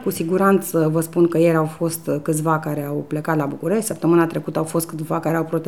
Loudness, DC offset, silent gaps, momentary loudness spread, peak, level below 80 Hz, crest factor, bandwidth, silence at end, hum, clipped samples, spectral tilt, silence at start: -20 LUFS; 0.3%; none; 7 LU; -4 dBFS; -62 dBFS; 16 dB; 18 kHz; 0 s; none; under 0.1%; -6.5 dB/octave; 0 s